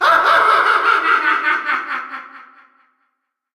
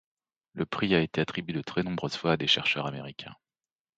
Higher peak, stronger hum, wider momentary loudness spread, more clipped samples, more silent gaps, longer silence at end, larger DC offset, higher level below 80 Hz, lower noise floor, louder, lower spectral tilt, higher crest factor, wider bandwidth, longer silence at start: first, -2 dBFS vs -8 dBFS; neither; second, 14 LU vs 17 LU; neither; neither; first, 1.1 s vs 0.65 s; neither; about the same, -64 dBFS vs -60 dBFS; second, -72 dBFS vs under -90 dBFS; first, -14 LUFS vs -28 LUFS; second, -1.5 dB/octave vs -5.5 dB/octave; second, 14 dB vs 22 dB; first, 15 kHz vs 8.8 kHz; second, 0 s vs 0.55 s